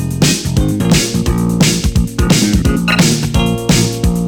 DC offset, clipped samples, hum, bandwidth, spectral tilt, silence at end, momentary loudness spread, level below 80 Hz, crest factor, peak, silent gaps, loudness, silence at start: under 0.1%; under 0.1%; none; 20 kHz; -4.5 dB/octave; 0 s; 4 LU; -22 dBFS; 10 dB; -2 dBFS; none; -13 LUFS; 0 s